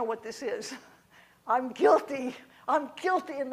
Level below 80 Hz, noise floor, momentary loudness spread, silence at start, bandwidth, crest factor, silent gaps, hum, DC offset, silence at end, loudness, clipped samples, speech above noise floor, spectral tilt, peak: -76 dBFS; -59 dBFS; 17 LU; 0 s; 15.5 kHz; 20 dB; none; none; under 0.1%; 0 s; -29 LUFS; under 0.1%; 31 dB; -3.5 dB/octave; -10 dBFS